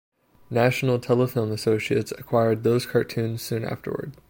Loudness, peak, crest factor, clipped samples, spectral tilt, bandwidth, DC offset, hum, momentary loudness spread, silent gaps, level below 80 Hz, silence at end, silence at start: -24 LUFS; -6 dBFS; 18 dB; under 0.1%; -6.5 dB/octave; 17 kHz; under 0.1%; none; 8 LU; none; -60 dBFS; 0.15 s; 0.5 s